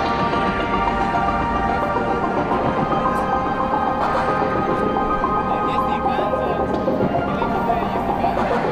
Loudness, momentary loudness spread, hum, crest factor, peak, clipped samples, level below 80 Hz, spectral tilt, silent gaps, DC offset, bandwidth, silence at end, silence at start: -20 LUFS; 1 LU; none; 12 dB; -8 dBFS; under 0.1%; -36 dBFS; -7 dB/octave; none; under 0.1%; 15.5 kHz; 0 s; 0 s